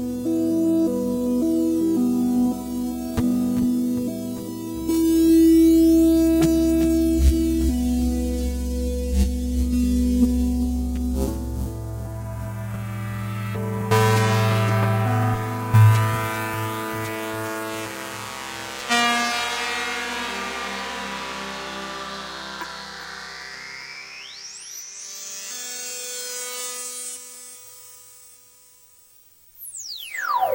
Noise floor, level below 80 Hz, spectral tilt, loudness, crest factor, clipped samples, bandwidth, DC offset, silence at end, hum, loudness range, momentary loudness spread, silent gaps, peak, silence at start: -53 dBFS; -32 dBFS; -5.5 dB/octave; -22 LUFS; 18 dB; under 0.1%; 16 kHz; under 0.1%; 0 s; none; 14 LU; 16 LU; none; -4 dBFS; 0 s